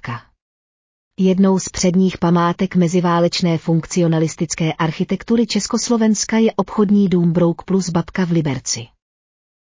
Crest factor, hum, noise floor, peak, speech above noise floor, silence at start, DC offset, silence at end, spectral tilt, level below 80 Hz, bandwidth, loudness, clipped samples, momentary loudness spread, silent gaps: 12 dB; none; under -90 dBFS; -4 dBFS; over 74 dB; 0.05 s; under 0.1%; 0.9 s; -5.5 dB/octave; -48 dBFS; 7.8 kHz; -17 LUFS; under 0.1%; 5 LU; 0.42-1.11 s